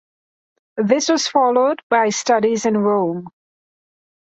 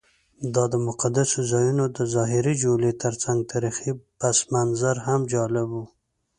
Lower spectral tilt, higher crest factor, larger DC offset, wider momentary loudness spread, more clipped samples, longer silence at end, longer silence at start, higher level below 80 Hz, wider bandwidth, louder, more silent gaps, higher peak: second, -4 dB/octave vs -5.5 dB/octave; about the same, 16 dB vs 18 dB; neither; about the same, 8 LU vs 6 LU; neither; first, 1.05 s vs 0.5 s; first, 0.75 s vs 0.4 s; second, -66 dBFS vs -58 dBFS; second, 8.2 kHz vs 11.5 kHz; first, -17 LUFS vs -23 LUFS; first, 1.83-1.90 s vs none; first, -2 dBFS vs -6 dBFS